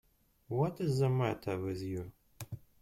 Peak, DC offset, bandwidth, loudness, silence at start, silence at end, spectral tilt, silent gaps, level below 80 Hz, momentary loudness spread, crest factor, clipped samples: -18 dBFS; under 0.1%; 16.5 kHz; -35 LUFS; 0.5 s; 0.25 s; -7.5 dB/octave; none; -64 dBFS; 16 LU; 16 dB; under 0.1%